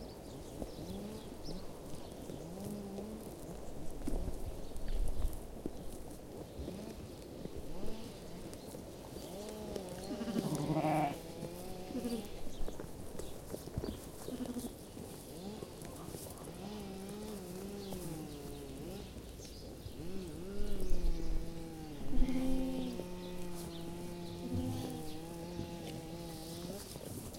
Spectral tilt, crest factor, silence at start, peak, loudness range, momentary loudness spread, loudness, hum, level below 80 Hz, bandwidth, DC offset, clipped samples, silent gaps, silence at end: -5.5 dB/octave; 22 dB; 0 s; -16 dBFS; 7 LU; 10 LU; -44 LUFS; none; -44 dBFS; 16.5 kHz; under 0.1%; under 0.1%; none; 0 s